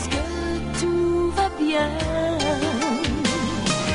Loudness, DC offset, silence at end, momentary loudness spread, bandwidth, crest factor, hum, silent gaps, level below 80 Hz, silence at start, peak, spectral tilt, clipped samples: -23 LUFS; under 0.1%; 0 s; 4 LU; 11 kHz; 16 dB; none; none; -36 dBFS; 0 s; -8 dBFS; -4.5 dB/octave; under 0.1%